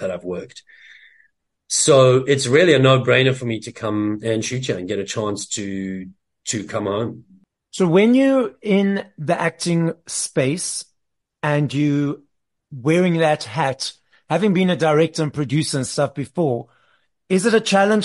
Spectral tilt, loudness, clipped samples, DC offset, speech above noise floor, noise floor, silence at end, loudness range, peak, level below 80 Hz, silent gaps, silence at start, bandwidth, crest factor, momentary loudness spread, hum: -5 dB/octave; -19 LUFS; under 0.1%; under 0.1%; 57 dB; -76 dBFS; 0 s; 8 LU; -2 dBFS; -60 dBFS; none; 0 s; 11.5 kHz; 18 dB; 13 LU; none